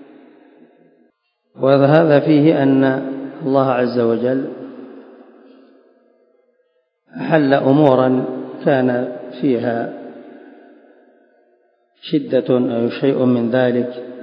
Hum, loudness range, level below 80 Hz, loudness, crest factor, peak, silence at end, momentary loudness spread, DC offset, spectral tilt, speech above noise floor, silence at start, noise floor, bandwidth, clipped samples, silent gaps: none; 9 LU; -70 dBFS; -16 LUFS; 18 dB; 0 dBFS; 0 s; 16 LU; under 0.1%; -10.5 dB/octave; 49 dB; 1.6 s; -64 dBFS; 5.4 kHz; under 0.1%; none